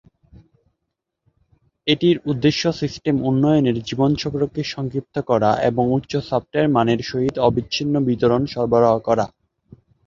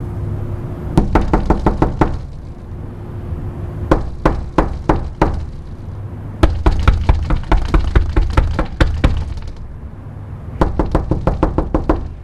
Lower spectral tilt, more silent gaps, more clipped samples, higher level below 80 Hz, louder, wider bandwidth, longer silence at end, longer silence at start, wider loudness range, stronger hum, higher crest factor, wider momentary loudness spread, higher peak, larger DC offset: second, -6.5 dB/octave vs -8 dB/octave; neither; neither; second, -48 dBFS vs -20 dBFS; about the same, -20 LUFS vs -18 LUFS; second, 7.4 kHz vs 10.5 kHz; first, 0.8 s vs 0 s; first, 1.85 s vs 0 s; about the same, 2 LU vs 3 LU; neither; about the same, 18 dB vs 16 dB; second, 7 LU vs 15 LU; about the same, -2 dBFS vs 0 dBFS; neither